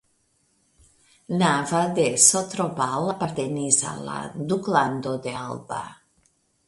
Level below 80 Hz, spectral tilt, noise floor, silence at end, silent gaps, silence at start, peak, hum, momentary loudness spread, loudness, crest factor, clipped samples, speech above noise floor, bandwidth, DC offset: -62 dBFS; -3.5 dB/octave; -67 dBFS; 0.75 s; none; 1.3 s; -2 dBFS; none; 16 LU; -23 LUFS; 22 dB; under 0.1%; 44 dB; 11.5 kHz; under 0.1%